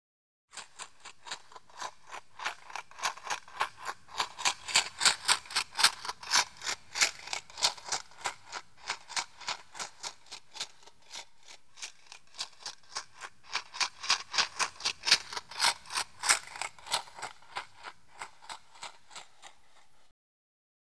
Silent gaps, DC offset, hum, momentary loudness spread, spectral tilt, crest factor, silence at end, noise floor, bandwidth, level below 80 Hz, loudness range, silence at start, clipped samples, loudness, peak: none; 0.2%; none; 21 LU; 2 dB/octave; 30 dB; 1.45 s; -64 dBFS; 11 kHz; -74 dBFS; 15 LU; 0.5 s; under 0.1%; -31 LUFS; -6 dBFS